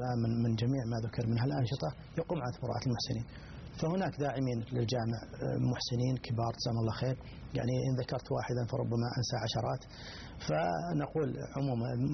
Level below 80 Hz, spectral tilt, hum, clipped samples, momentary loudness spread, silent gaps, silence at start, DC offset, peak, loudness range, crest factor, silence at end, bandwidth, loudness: -54 dBFS; -6.5 dB/octave; none; under 0.1%; 6 LU; none; 0 s; under 0.1%; -22 dBFS; 2 LU; 12 dB; 0 s; 6.4 kHz; -35 LUFS